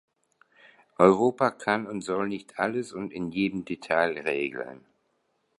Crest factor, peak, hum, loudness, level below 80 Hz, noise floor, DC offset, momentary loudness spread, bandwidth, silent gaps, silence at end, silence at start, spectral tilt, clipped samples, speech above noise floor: 24 dB; -4 dBFS; none; -27 LUFS; -66 dBFS; -73 dBFS; under 0.1%; 13 LU; 11.5 kHz; none; 0.85 s; 1 s; -6 dB/octave; under 0.1%; 47 dB